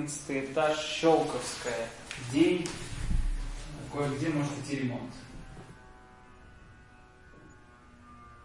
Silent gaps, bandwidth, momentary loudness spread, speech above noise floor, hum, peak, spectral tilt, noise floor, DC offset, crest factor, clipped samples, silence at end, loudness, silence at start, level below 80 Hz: none; 11.5 kHz; 22 LU; 25 dB; none; -12 dBFS; -5 dB/octave; -55 dBFS; under 0.1%; 22 dB; under 0.1%; 0 s; -31 LUFS; 0 s; -42 dBFS